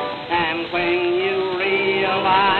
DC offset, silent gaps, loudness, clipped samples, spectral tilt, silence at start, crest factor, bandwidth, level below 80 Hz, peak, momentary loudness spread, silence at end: under 0.1%; none; -19 LUFS; under 0.1%; -6.5 dB/octave; 0 s; 16 dB; 4.9 kHz; -54 dBFS; -4 dBFS; 4 LU; 0 s